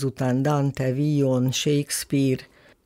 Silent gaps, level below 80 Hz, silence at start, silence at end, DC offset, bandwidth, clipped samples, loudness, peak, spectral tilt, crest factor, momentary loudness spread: none; -58 dBFS; 0 s; 0.4 s; under 0.1%; 16 kHz; under 0.1%; -23 LUFS; -12 dBFS; -5.5 dB/octave; 12 dB; 3 LU